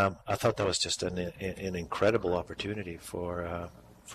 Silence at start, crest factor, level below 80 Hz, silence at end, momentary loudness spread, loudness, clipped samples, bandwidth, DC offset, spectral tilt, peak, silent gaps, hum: 0 s; 16 dB; -56 dBFS; 0 s; 11 LU; -32 LUFS; under 0.1%; 15 kHz; under 0.1%; -4 dB/octave; -16 dBFS; none; none